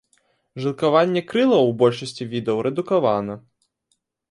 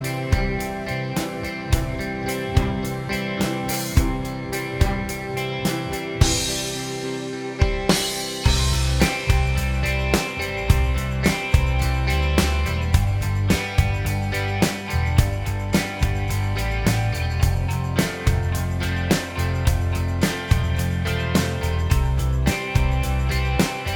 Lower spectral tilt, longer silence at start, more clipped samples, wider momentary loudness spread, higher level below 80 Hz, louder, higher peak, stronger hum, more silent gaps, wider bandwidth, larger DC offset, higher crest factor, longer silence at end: first, -6.5 dB/octave vs -5 dB/octave; first, 0.55 s vs 0 s; neither; first, 12 LU vs 6 LU; second, -64 dBFS vs -26 dBFS; first, -20 LUFS vs -23 LUFS; about the same, -4 dBFS vs -2 dBFS; neither; neither; second, 11.5 kHz vs 20 kHz; neither; about the same, 18 dB vs 20 dB; first, 0.9 s vs 0 s